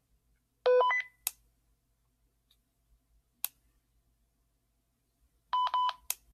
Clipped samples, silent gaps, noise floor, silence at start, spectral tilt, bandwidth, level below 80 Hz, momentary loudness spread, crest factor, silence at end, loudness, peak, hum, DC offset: under 0.1%; none; -77 dBFS; 0.65 s; 1.5 dB/octave; 15 kHz; -74 dBFS; 13 LU; 24 dB; 0.2 s; -31 LUFS; -12 dBFS; none; under 0.1%